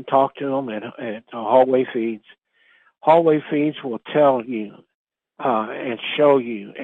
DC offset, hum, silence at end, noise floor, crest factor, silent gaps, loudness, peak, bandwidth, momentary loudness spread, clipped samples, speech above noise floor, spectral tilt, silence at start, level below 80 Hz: under 0.1%; none; 0 s; -58 dBFS; 18 dB; 4.94-5.05 s; -20 LUFS; -2 dBFS; 4.2 kHz; 14 LU; under 0.1%; 38 dB; -8.5 dB/octave; 0 s; -72 dBFS